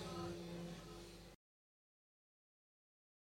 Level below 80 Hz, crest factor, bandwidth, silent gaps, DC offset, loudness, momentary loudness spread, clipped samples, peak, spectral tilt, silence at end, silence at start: -68 dBFS; 18 dB; 16.5 kHz; none; under 0.1%; -51 LUFS; 14 LU; under 0.1%; -36 dBFS; -5.5 dB/octave; 1.95 s; 0 s